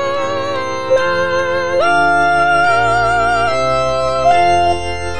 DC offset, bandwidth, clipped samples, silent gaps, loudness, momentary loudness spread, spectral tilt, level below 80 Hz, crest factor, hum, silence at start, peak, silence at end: 4%; 10 kHz; under 0.1%; none; -14 LUFS; 7 LU; -4.5 dB/octave; -38 dBFS; 12 dB; none; 0 s; -2 dBFS; 0 s